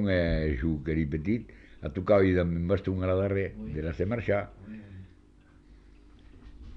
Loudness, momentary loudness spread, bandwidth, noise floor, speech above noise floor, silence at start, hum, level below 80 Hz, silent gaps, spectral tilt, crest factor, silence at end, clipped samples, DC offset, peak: -29 LUFS; 20 LU; 6.2 kHz; -57 dBFS; 29 dB; 0 s; none; -42 dBFS; none; -9.5 dB/octave; 18 dB; 0 s; under 0.1%; under 0.1%; -12 dBFS